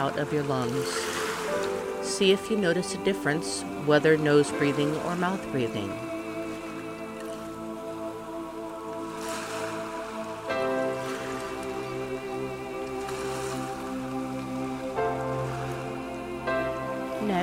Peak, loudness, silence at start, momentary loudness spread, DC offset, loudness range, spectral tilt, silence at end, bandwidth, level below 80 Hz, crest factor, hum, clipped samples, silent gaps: -8 dBFS; -29 LUFS; 0 s; 13 LU; under 0.1%; 10 LU; -5 dB/octave; 0 s; 16 kHz; -56 dBFS; 20 dB; none; under 0.1%; none